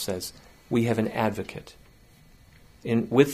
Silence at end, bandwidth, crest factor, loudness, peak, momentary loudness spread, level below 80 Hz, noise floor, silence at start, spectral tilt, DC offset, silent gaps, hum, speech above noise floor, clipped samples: 0 s; 15.5 kHz; 22 dB; -27 LUFS; -4 dBFS; 15 LU; -56 dBFS; -54 dBFS; 0 s; -6 dB/octave; under 0.1%; none; none; 29 dB; under 0.1%